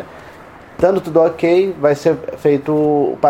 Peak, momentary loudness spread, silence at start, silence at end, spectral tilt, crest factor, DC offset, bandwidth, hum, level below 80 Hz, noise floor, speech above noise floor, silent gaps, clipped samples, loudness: 0 dBFS; 4 LU; 0 s; 0 s; -7.5 dB/octave; 14 dB; under 0.1%; 16 kHz; none; -50 dBFS; -38 dBFS; 24 dB; none; under 0.1%; -15 LUFS